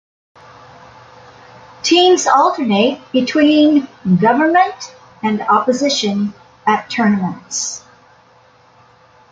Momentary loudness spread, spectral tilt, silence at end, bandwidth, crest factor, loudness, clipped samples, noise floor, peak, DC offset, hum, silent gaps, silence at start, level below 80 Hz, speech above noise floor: 11 LU; -4 dB/octave; 1.55 s; 9.4 kHz; 14 dB; -14 LUFS; under 0.1%; -49 dBFS; -2 dBFS; under 0.1%; none; none; 1.85 s; -58 dBFS; 35 dB